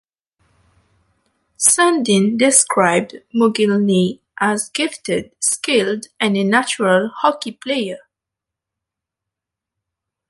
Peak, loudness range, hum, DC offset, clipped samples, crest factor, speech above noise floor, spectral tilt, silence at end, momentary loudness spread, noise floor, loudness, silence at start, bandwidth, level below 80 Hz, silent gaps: 0 dBFS; 6 LU; none; under 0.1%; under 0.1%; 18 dB; 68 dB; -3.5 dB/octave; 2.3 s; 10 LU; -84 dBFS; -16 LUFS; 1.6 s; 12 kHz; -62 dBFS; none